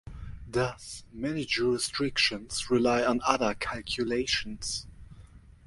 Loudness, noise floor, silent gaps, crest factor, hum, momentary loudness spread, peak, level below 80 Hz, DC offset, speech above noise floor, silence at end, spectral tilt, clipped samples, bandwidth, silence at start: -29 LUFS; -52 dBFS; none; 24 dB; none; 12 LU; -6 dBFS; -50 dBFS; under 0.1%; 23 dB; 0 s; -3.5 dB/octave; under 0.1%; 11.5 kHz; 0.05 s